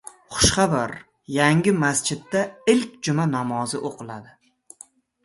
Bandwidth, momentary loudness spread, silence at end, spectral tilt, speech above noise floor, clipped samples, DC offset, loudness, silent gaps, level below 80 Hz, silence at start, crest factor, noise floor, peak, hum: 12 kHz; 15 LU; 1 s; -4 dB/octave; 29 dB; under 0.1%; under 0.1%; -22 LUFS; none; -44 dBFS; 0.3 s; 22 dB; -51 dBFS; -2 dBFS; none